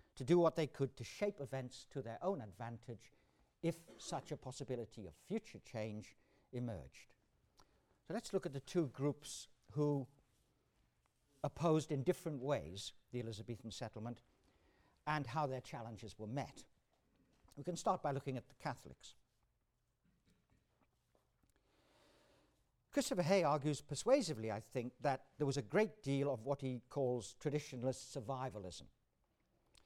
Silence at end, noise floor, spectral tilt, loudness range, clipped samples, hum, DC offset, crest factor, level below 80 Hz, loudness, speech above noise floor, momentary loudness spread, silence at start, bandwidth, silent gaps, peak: 1 s; -83 dBFS; -6 dB/octave; 9 LU; under 0.1%; none; under 0.1%; 22 dB; -72 dBFS; -42 LUFS; 42 dB; 15 LU; 0.15 s; 16 kHz; none; -20 dBFS